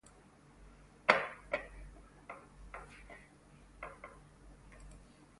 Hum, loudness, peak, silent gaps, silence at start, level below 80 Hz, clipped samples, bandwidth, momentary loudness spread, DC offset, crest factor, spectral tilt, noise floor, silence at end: none; -35 LUFS; -10 dBFS; none; 0.05 s; -60 dBFS; under 0.1%; 11.5 kHz; 29 LU; under 0.1%; 32 dB; -4 dB/octave; -62 dBFS; 0.15 s